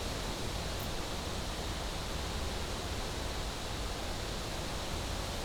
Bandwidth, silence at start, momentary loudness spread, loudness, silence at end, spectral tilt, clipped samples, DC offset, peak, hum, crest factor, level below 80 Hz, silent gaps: over 20 kHz; 0 s; 1 LU; -38 LUFS; 0 s; -3.5 dB/octave; under 0.1%; under 0.1%; -24 dBFS; none; 12 dB; -42 dBFS; none